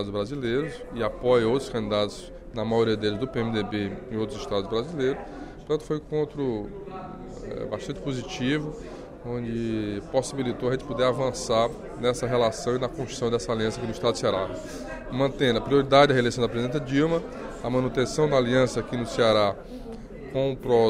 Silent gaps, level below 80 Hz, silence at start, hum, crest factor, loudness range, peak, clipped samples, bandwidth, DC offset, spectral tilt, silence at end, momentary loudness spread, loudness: none; -46 dBFS; 0 s; none; 20 dB; 7 LU; -6 dBFS; under 0.1%; 14 kHz; under 0.1%; -5.5 dB/octave; 0 s; 15 LU; -26 LUFS